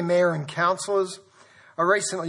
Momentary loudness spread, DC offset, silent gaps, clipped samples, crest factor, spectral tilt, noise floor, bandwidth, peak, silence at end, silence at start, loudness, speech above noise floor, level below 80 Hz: 13 LU; under 0.1%; none; under 0.1%; 16 dB; -4 dB/octave; -53 dBFS; 11.5 kHz; -8 dBFS; 0 s; 0 s; -24 LUFS; 30 dB; -76 dBFS